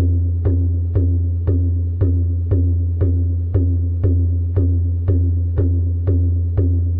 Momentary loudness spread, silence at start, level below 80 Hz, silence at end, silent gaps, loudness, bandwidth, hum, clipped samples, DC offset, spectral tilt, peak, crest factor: 1 LU; 0 s; -24 dBFS; 0 s; none; -18 LUFS; 1.8 kHz; none; under 0.1%; under 0.1%; -14.5 dB/octave; -6 dBFS; 10 dB